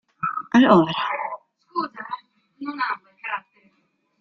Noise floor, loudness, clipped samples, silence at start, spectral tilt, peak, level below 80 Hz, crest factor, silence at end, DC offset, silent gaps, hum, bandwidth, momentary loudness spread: -68 dBFS; -22 LUFS; under 0.1%; 0.2 s; -6.5 dB/octave; -2 dBFS; -64 dBFS; 22 dB; 0.8 s; under 0.1%; none; none; 6.8 kHz; 19 LU